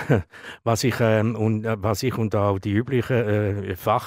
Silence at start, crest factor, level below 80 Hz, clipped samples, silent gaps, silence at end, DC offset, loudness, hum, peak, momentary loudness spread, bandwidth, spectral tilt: 0 s; 16 dB; -54 dBFS; under 0.1%; none; 0 s; under 0.1%; -23 LUFS; none; -6 dBFS; 5 LU; 16 kHz; -6.5 dB/octave